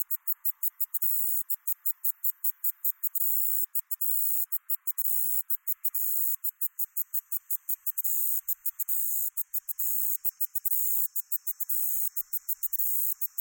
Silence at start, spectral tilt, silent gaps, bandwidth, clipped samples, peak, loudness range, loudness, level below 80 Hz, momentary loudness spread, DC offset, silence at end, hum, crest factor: 0 s; 7 dB/octave; none; 17 kHz; under 0.1%; -12 dBFS; 2 LU; -26 LUFS; under -90 dBFS; 5 LU; under 0.1%; 0 s; none; 18 dB